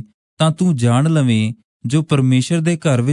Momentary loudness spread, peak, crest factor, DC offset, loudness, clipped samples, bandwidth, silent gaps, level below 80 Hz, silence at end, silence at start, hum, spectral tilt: 5 LU; -4 dBFS; 12 dB; under 0.1%; -16 LUFS; under 0.1%; 11 kHz; 0.14-0.37 s, 1.64-1.80 s; -58 dBFS; 0 s; 0 s; none; -6.5 dB/octave